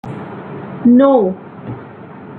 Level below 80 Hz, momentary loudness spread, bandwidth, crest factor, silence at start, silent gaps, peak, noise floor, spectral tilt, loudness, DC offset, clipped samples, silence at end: -56 dBFS; 22 LU; 3.9 kHz; 14 dB; 0.05 s; none; -2 dBFS; -34 dBFS; -10.5 dB/octave; -12 LUFS; under 0.1%; under 0.1%; 0 s